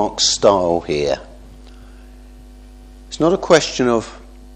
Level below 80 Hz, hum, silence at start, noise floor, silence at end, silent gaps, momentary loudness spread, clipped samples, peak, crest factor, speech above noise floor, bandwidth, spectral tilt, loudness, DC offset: -40 dBFS; none; 0 s; -39 dBFS; 0 s; none; 11 LU; under 0.1%; 0 dBFS; 18 dB; 23 dB; 10 kHz; -3.5 dB/octave; -16 LUFS; under 0.1%